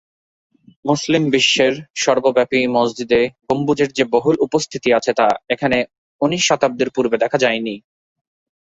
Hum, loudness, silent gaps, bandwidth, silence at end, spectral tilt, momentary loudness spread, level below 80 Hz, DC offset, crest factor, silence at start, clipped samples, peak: none; -17 LUFS; 1.90-1.94 s, 5.98-6.19 s; 8 kHz; 0.85 s; -4 dB/octave; 6 LU; -56 dBFS; under 0.1%; 16 dB; 0.85 s; under 0.1%; -2 dBFS